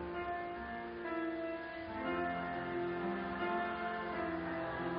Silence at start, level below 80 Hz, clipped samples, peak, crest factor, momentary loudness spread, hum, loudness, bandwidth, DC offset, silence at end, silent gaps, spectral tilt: 0 s; -62 dBFS; under 0.1%; -26 dBFS; 14 dB; 6 LU; none; -40 LUFS; 5.2 kHz; under 0.1%; 0 s; none; -4 dB/octave